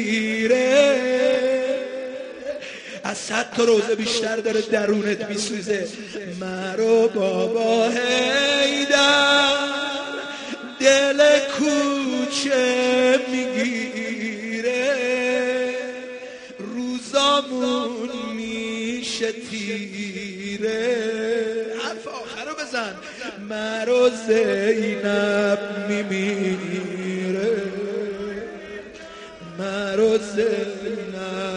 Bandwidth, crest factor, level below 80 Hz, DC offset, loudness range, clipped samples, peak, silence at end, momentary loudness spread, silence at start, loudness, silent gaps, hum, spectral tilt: 10.5 kHz; 20 dB; -62 dBFS; under 0.1%; 8 LU; under 0.1%; -2 dBFS; 0 s; 14 LU; 0 s; -21 LUFS; none; none; -3.5 dB/octave